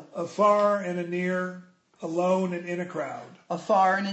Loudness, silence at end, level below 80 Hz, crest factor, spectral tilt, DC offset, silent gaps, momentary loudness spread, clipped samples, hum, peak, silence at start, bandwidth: -26 LUFS; 0 s; -76 dBFS; 16 dB; -6 dB/octave; under 0.1%; none; 14 LU; under 0.1%; none; -10 dBFS; 0 s; 8.4 kHz